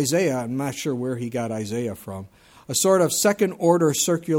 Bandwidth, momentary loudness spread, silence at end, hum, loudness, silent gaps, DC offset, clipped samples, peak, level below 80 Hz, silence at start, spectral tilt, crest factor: 18 kHz; 11 LU; 0 s; none; -22 LUFS; none; under 0.1%; under 0.1%; -6 dBFS; -62 dBFS; 0 s; -4.5 dB/octave; 18 dB